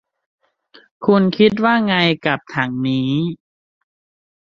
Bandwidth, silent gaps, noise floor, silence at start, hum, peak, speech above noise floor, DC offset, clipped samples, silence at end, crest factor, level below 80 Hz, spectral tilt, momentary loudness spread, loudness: 7 kHz; none; -51 dBFS; 1 s; none; -2 dBFS; 35 dB; under 0.1%; under 0.1%; 1.25 s; 18 dB; -58 dBFS; -7.5 dB/octave; 9 LU; -17 LUFS